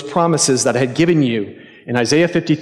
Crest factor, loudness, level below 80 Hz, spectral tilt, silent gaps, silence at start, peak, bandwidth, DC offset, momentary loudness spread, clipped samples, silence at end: 14 dB; -15 LUFS; -56 dBFS; -4.5 dB/octave; none; 0 s; -2 dBFS; 13 kHz; under 0.1%; 9 LU; under 0.1%; 0 s